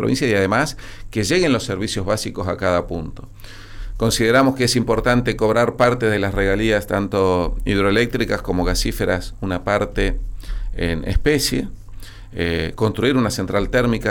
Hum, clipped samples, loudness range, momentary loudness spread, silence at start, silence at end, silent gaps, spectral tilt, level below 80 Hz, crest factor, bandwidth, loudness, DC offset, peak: none; under 0.1%; 5 LU; 14 LU; 0 s; 0 s; none; -5 dB/octave; -30 dBFS; 14 dB; 18.5 kHz; -19 LUFS; under 0.1%; -6 dBFS